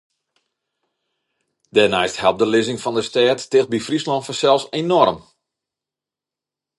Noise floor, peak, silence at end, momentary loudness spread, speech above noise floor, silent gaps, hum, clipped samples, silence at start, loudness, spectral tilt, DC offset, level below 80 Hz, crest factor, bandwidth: -88 dBFS; 0 dBFS; 1.6 s; 6 LU; 70 dB; none; none; under 0.1%; 1.75 s; -18 LUFS; -4.5 dB/octave; under 0.1%; -58 dBFS; 20 dB; 11.5 kHz